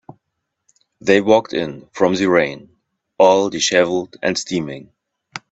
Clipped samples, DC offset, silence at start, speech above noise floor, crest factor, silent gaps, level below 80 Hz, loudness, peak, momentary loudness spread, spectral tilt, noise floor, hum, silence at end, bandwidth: under 0.1%; under 0.1%; 1.05 s; 60 dB; 18 dB; none; -58 dBFS; -17 LUFS; 0 dBFS; 17 LU; -4 dB/octave; -76 dBFS; none; 0.15 s; 8.2 kHz